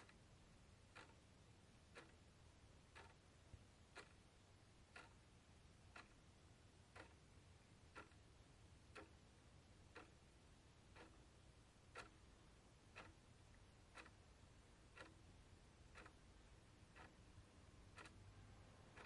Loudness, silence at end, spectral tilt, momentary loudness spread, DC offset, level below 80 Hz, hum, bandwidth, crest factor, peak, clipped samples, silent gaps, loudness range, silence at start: -66 LUFS; 0 s; -4.5 dB/octave; 6 LU; under 0.1%; -74 dBFS; none; 11 kHz; 24 dB; -44 dBFS; under 0.1%; none; 1 LU; 0 s